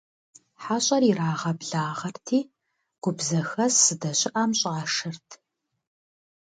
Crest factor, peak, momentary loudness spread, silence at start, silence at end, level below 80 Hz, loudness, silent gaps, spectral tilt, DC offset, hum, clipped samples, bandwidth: 22 dB; -6 dBFS; 13 LU; 0.6 s; 1.25 s; -72 dBFS; -24 LUFS; none; -3.5 dB/octave; under 0.1%; none; under 0.1%; 9.6 kHz